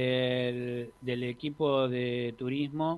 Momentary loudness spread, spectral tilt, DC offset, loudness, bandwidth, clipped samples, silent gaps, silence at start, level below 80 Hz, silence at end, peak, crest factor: 8 LU; -7.5 dB/octave; under 0.1%; -32 LUFS; 12 kHz; under 0.1%; none; 0 s; -66 dBFS; 0 s; -14 dBFS; 16 dB